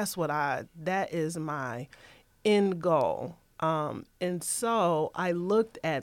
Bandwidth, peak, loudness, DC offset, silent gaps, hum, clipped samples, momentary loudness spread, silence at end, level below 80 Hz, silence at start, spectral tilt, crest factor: 17 kHz; -14 dBFS; -29 LUFS; under 0.1%; none; none; under 0.1%; 10 LU; 0 s; -66 dBFS; 0 s; -5 dB/octave; 16 dB